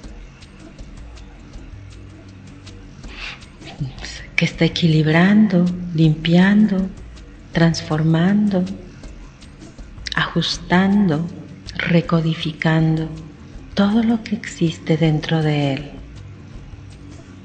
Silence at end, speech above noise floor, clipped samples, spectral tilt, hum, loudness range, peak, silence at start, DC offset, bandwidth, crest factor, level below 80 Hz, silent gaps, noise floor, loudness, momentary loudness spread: 0 s; 24 dB; under 0.1%; -6.5 dB/octave; none; 11 LU; 0 dBFS; 0 s; under 0.1%; 8.8 kHz; 20 dB; -40 dBFS; none; -40 dBFS; -18 LUFS; 25 LU